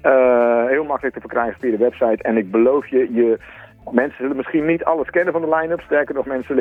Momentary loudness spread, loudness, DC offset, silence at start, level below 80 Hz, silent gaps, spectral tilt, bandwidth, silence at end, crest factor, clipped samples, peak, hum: 7 LU; -18 LUFS; under 0.1%; 0.05 s; -52 dBFS; none; -9 dB/octave; 3.8 kHz; 0 s; 18 dB; under 0.1%; 0 dBFS; none